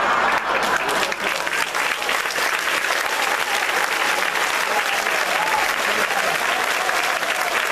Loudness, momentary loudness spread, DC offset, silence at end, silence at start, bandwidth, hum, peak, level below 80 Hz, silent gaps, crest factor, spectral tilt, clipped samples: -19 LUFS; 2 LU; under 0.1%; 0 s; 0 s; 14.5 kHz; none; 0 dBFS; -56 dBFS; none; 20 dB; -0.5 dB/octave; under 0.1%